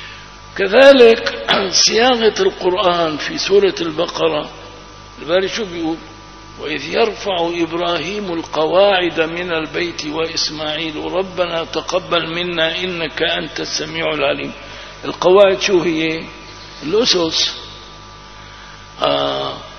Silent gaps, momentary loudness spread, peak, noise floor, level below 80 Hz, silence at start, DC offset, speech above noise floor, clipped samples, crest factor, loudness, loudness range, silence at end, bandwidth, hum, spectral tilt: none; 22 LU; 0 dBFS; -36 dBFS; -44 dBFS; 0 s; under 0.1%; 21 dB; under 0.1%; 16 dB; -16 LUFS; 8 LU; 0 s; 8.4 kHz; 50 Hz at -45 dBFS; -3 dB/octave